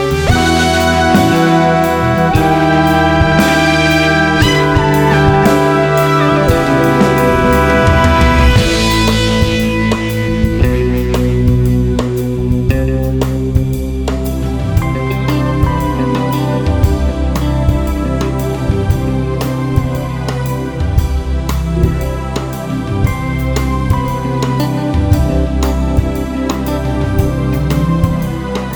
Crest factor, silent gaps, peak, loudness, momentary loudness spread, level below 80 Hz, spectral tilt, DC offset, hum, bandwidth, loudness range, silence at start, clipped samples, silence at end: 12 dB; none; 0 dBFS; -13 LUFS; 8 LU; -20 dBFS; -6 dB/octave; under 0.1%; none; over 20 kHz; 6 LU; 0 s; 0.1%; 0 s